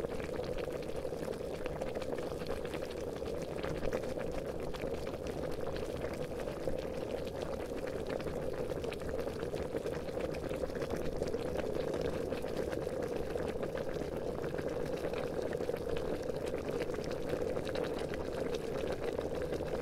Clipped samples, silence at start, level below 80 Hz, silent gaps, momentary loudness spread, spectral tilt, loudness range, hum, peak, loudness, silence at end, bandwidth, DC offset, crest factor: under 0.1%; 0 s; -50 dBFS; none; 3 LU; -6 dB/octave; 2 LU; none; -20 dBFS; -39 LUFS; 0 s; 16 kHz; under 0.1%; 18 dB